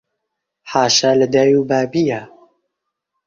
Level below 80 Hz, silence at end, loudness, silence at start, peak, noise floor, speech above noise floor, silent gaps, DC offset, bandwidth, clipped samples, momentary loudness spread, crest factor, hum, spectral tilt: -58 dBFS; 1 s; -15 LUFS; 0.65 s; 0 dBFS; -77 dBFS; 63 dB; none; under 0.1%; 7.4 kHz; under 0.1%; 8 LU; 16 dB; none; -4 dB/octave